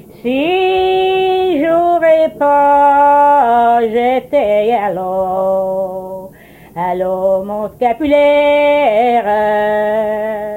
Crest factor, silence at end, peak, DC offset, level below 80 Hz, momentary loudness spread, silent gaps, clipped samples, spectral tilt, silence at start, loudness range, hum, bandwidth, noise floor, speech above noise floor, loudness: 12 dB; 0 s; 0 dBFS; under 0.1%; -46 dBFS; 10 LU; none; under 0.1%; -6 dB/octave; 0.25 s; 6 LU; none; 16.5 kHz; -37 dBFS; 25 dB; -12 LUFS